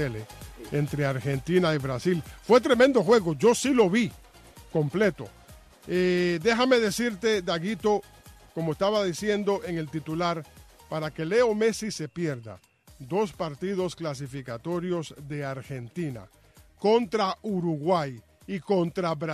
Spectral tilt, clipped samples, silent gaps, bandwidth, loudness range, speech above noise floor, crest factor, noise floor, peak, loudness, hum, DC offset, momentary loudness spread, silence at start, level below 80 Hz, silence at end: -5.5 dB/octave; under 0.1%; none; 14 kHz; 9 LU; 25 dB; 18 dB; -50 dBFS; -8 dBFS; -26 LUFS; none; under 0.1%; 14 LU; 0 s; -56 dBFS; 0 s